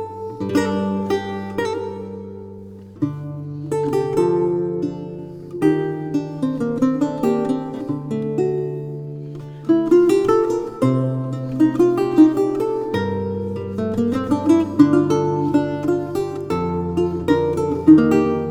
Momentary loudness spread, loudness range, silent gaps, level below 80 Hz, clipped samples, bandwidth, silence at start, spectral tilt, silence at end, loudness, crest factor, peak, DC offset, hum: 16 LU; 5 LU; none; -50 dBFS; under 0.1%; 13.5 kHz; 0 s; -8 dB/octave; 0 s; -19 LUFS; 18 dB; 0 dBFS; under 0.1%; none